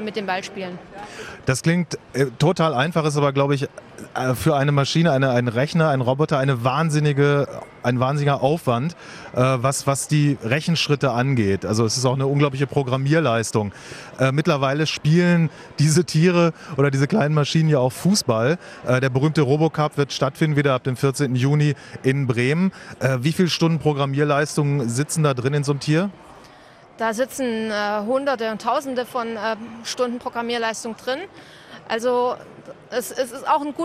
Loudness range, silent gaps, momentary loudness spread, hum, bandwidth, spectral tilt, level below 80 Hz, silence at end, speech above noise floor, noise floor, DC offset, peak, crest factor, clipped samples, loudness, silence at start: 5 LU; none; 9 LU; none; 15 kHz; -5.5 dB/octave; -56 dBFS; 0 s; 27 dB; -47 dBFS; under 0.1%; -4 dBFS; 16 dB; under 0.1%; -21 LUFS; 0 s